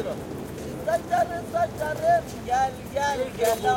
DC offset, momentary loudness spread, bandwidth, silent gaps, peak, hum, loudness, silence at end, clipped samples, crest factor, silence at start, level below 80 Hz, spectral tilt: under 0.1%; 10 LU; 17 kHz; none; -10 dBFS; none; -26 LUFS; 0 s; under 0.1%; 14 dB; 0 s; -48 dBFS; -4.5 dB/octave